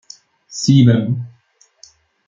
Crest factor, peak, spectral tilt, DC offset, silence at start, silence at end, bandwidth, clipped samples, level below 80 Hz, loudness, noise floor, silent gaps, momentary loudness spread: 16 dB; -2 dBFS; -6.5 dB/octave; under 0.1%; 0.5 s; 1 s; 7.6 kHz; under 0.1%; -52 dBFS; -15 LUFS; -56 dBFS; none; 20 LU